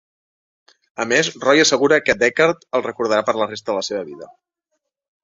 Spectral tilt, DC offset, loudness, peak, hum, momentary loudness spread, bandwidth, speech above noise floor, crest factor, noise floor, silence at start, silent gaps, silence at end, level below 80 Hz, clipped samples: -3 dB/octave; under 0.1%; -18 LUFS; -2 dBFS; none; 14 LU; 7.8 kHz; 58 dB; 18 dB; -76 dBFS; 1 s; none; 1 s; -60 dBFS; under 0.1%